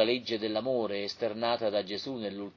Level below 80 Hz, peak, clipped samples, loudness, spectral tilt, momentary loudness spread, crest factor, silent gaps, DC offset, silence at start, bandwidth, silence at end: -68 dBFS; -12 dBFS; under 0.1%; -32 LUFS; -5 dB/octave; 7 LU; 18 dB; none; under 0.1%; 0 s; 7.2 kHz; 0.05 s